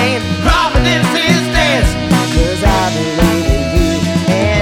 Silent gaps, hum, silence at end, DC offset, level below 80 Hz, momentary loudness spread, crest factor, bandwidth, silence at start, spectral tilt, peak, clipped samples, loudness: none; none; 0 s; under 0.1%; -20 dBFS; 3 LU; 12 dB; 17 kHz; 0 s; -5 dB/octave; 0 dBFS; under 0.1%; -13 LUFS